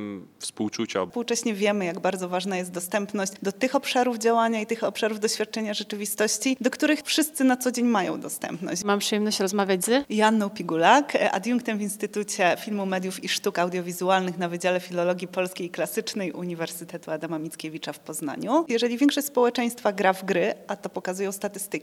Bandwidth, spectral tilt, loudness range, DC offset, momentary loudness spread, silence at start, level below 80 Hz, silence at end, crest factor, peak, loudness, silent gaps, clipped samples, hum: 16.5 kHz; -3.5 dB/octave; 5 LU; under 0.1%; 9 LU; 0 s; -76 dBFS; 0 s; 22 dB; -2 dBFS; -25 LUFS; none; under 0.1%; none